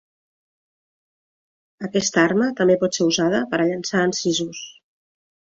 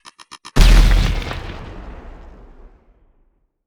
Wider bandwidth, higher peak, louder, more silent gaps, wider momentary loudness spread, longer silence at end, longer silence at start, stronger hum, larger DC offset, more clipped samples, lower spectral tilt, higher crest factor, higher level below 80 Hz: second, 7.8 kHz vs 14 kHz; second, -4 dBFS vs 0 dBFS; second, -20 LUFS vs -17 LUFS; neither; second, 12 LU vs 26 LU; second, 0.85 s vs 1.75 s; first, 1.8 s vs 0.55 s; neither; neither; neither; about the same, -4 dB/octave vs -5 dB/octave; about the same, 20 dB vs 18 dB; second, -64 dBFS vs -18 dBFS